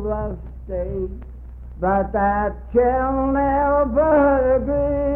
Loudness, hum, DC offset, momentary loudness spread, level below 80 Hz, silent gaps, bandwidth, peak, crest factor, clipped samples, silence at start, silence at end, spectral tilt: -19 LUFS; none; under 0.1%; 16 LU; -32 dBFS; none; 3.2 kHz; -6 dBFS; 14 dB; under 0.1%; 0 s; 0 s; -11.5 dB/octave